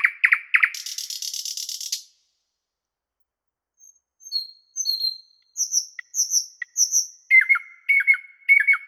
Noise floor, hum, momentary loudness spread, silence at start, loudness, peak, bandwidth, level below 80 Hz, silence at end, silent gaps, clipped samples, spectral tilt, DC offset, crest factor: -86 dBFS; none; 13 LU; 0 s; -20 LUFS; -4 dBFS; 20 kHz; under -90 dBFS; 0 s; none; under 0.1%; 11 dB/octave; under 0.1%; 20 dB